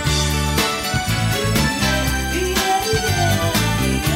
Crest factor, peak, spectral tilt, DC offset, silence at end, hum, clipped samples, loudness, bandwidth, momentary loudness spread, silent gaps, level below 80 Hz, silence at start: 12 dB; -6 dBFS; -4 dB/octave; under 0.1%; 0 s; none; under 0.1%; -18 LUFS; 16.5 kHz; 2 LU; none; -28 dBFS; 0 s